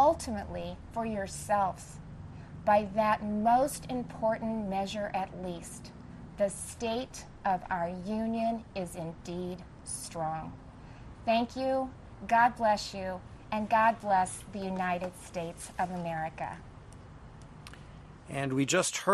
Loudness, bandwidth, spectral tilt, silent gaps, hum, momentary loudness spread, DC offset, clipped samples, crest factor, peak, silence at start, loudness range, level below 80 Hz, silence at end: -32 LUFS; 12.5 kHz; -4.5 dB/octave; none; none; 21 LU; under 0.1%; under 0.1%; 20 dB; -12 dBFS; 0 s; 7 LU; -54 dBFS; 0 s